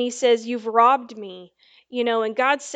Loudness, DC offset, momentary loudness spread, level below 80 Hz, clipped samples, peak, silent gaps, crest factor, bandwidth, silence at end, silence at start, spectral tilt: -20 LUFS; under 0.1%; 19 LU; -80 dBFS; under 0.1%; -4 dBFS; none; 18 dB; 9.2 kHz; 0 s; 0 s; -2.5 dB/octave